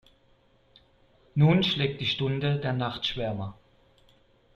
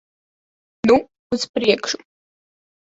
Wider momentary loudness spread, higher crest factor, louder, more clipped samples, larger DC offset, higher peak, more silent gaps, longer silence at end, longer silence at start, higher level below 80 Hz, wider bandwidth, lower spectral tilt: about the same, 12 LU vs 10 LU; about the same, 20 dB vs 20 dB; second, -27 LUFS vs -20 LUFS; neither; neither; second, -8 dBFS vs -2 dBFS; second, none vs 1.19-1.30 s, 1.49-1.54 s; first, 1.05 s vs 0.9 s; first, 1.35 s vs 0.85 s; about the same, -56 dBFS vs -56 dBFS; second, 6.8 kHz vs 8 kHz; first, -7 dB/octave vs -3.5 dB/octave